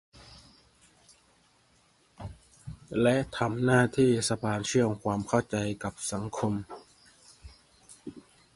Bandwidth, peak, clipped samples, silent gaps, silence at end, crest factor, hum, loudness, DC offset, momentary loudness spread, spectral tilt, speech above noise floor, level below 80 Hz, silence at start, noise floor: 11.5 kHz; -10 dBFS; under 0.1%; none; 0.35 s; 22 dB; none; -28 LUFS; under 0.1%; 22 LU; -5.5 dB/octave; 38 dB; -56 dBFS; 0.3 s; -65 dBFS